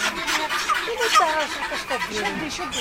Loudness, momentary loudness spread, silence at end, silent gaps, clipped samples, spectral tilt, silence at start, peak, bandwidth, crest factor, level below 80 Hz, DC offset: -22 LUFS; 8 LU; 0 s; none; under 0.1%; -1.5 dB/octave; 0 s; -6 dBFS; 16 kHz; 18 dB; -50 dBFS; under 0.1%